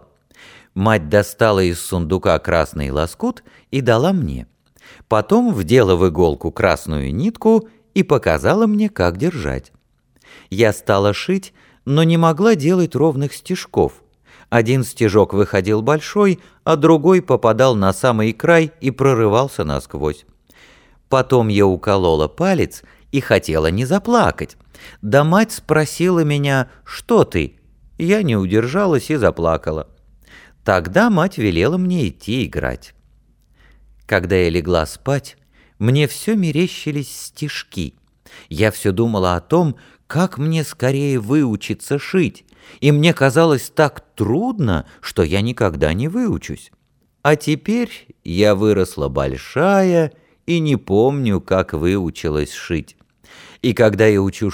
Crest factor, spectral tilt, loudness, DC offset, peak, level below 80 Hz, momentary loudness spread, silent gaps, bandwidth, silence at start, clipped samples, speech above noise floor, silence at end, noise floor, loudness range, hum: 16 dB; -6.5 dB/octave; -17 LUFS; under 0.1%; 0 dBFS; -38 dBFS; 11 LU; none; over 20 kHz; 0.75 s; under 0.1%; 41 dB; 0 s; -57 dBFS; 5 LU; none